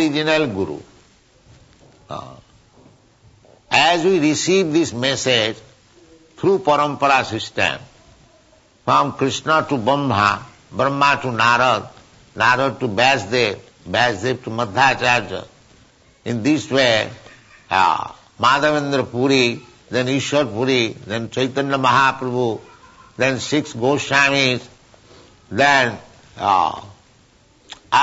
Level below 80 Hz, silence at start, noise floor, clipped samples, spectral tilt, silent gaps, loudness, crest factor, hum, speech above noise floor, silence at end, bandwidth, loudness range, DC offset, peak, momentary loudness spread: -56 dBFS; 0 s; -53 dBFS; under 0.1%; -4 dB/octave; none; -18 LUFS; 16 dB; none; 36 dB; 0 s; 8 kHz; 3 LU; under 0.1%; -4 dBFS; 12 LU